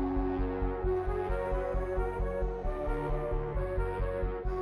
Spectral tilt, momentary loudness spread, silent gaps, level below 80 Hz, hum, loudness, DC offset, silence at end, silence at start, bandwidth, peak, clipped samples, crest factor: -9.5 dB/octave; 3 LU; none; -36 dBFS; none; -34 LUFS; under 0.1%; 0 s; 0 s; 4.7 kHz; -20 dBFS; under 0.1%; 12 dB